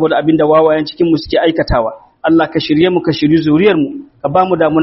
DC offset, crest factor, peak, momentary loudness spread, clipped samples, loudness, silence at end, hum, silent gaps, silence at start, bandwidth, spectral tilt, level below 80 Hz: under 0.1%; 12 dB; 0 dBFS; 6 LU; under 0.1%; -12 LUFS; 0 s; none; none; 0 s; 6 kHz; -5 dB/octave; -34 dBFS